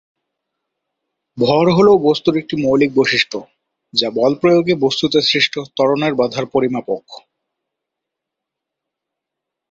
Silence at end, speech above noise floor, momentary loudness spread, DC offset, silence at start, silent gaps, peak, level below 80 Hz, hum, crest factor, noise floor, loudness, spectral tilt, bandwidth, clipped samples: 2.5 s; 66 dB; 8 LU; under 0.1%; 1.35 s; none; 0 dBFS; -56 dBFS; none; 16 dB; -81 dBFS; -15 LUFS; -5.5 dB/octave; 7.8 kHz; under 0.1%